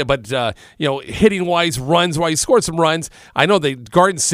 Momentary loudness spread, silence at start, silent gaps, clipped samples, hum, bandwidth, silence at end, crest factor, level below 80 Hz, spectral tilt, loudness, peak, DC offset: 7 LU; 0 s; none; under 0.1%; none; 16 kHz; 0 s; 16 dB; -44 dBFS; -4 dB/octave; -17 LUFS; 0 dBFS; under 0.1%